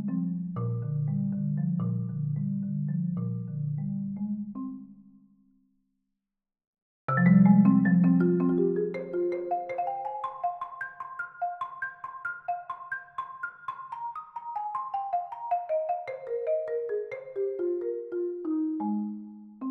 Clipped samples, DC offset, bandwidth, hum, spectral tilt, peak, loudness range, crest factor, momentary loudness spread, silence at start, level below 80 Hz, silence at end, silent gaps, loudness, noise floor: under 0.1%; under 0.1%; 3.9 kHz; none; -12 dB/octave; -10 dBFS; 12 LU; 20 dB; 15 LU; 0 s; -72 dBFS; 0 s; 6.67-6.73 s, 6.82-7.08 s; -29 LUFS; -87 dBFS